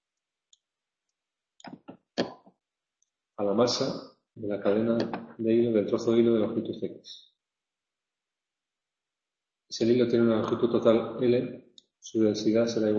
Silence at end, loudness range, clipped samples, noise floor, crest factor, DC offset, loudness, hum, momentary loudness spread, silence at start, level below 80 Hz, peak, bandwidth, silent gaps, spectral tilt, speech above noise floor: 0 s; 12 LU; under 0.1%; -90 dBFS; 20 dB; under 0.1%; -27 LUFS; none; 17 LU; 1.65 s; -68 dBFS; -8 dBFS; 7.4 kHz; none; -6 dB/octave; 64 dB